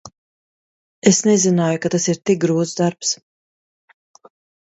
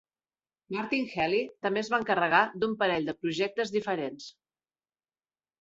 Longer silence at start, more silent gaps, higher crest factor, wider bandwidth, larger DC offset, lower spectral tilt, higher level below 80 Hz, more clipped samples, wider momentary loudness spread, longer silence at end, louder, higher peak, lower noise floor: second, 0.05 s vs 0.7 s; first, 0.18-1.02 s vs none; about the same, 20 dB vs 24 dB; about the same, 8.2 kHz vs 8 kHz; neither; about the same, -4.5 dB/octave vs -5 dB/octave; first, -60 dBFS vs -70 dBFS; neither; second, 7 LU vs 12 LU; first, 1.5 s vs 1.3 s; first, -18 LUFS vs -29 LUFS; first, 0 dBFS vs -8 dBFS; about the same, under -90 dBFS vs under -90 dBFS